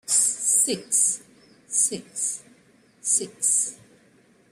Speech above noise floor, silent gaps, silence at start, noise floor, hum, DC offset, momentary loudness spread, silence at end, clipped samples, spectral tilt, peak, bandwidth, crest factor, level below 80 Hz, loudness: 32 dB; none; 0.05 s; -58 dBFS; none; under 0.1%; 10 LU; 0.75 s; under 0.1%; -0.5 dB/octave; -6 dBFS; 15.5 kHz; 20 dB; -74 dBFS; -22 LUFS